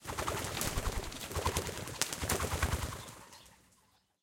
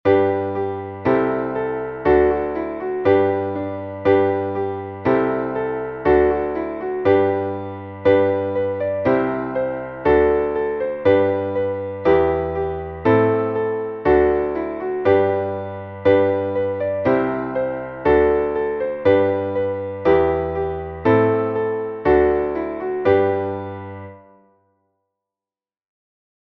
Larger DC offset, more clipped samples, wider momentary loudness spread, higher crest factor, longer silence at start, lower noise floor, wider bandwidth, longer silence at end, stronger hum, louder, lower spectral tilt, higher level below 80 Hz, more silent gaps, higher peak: neither; neither; first, 15 LU vs 9 LU; first, 32 dB vs 16 dB; about the same, 0 s vs 0.05 s; second, -70 dBFS vs under -90 dBFS; first, 17 kHz vs 5 kHz; second, 0.65 s vs 2.3 s; neither; second, -36 LUFS vs -20 LUFS; second, -3 dB/octave vs -9.5 dB/octave; about the same, -46 dBFS vs -42 dBFS; neither; about the same, -4 dBFS vs -4 dBFS